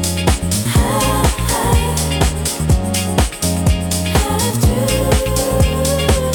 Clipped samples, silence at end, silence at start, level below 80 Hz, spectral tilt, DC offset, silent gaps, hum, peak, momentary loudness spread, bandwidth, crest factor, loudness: under 0.1%; 0 s; 0 s; -22 dBFS; -4.5 dB/octave; under 0.1%; none; none; -2 dBFS; 2 LU; 19 kHz; 14 dB; -16 LUFS